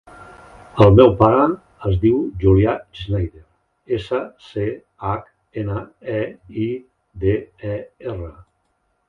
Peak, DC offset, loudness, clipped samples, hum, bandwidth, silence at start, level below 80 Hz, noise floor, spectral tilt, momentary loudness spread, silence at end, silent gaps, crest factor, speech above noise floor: 0 dBFS; under 0.1%; -19 LUFS; under 0.1%; none; 5.8 kHz; 0.2 s; -36 dBFS; -68 dBFS; -9.5 dB/octave; 18 LU; 0.8 s; none; 20 dB; 50 dB